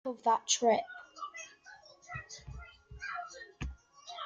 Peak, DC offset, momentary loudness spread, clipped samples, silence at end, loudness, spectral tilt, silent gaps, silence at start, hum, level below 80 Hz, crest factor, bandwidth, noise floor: -14 dBFS; under 0.1%; 24 LU; under 0.1%; 0 s; -34 LUFS; -2.5 dB/octave; none; 0.05 s; none; -54 dBFS; 22 dB; 10 kHz; -57 dBFS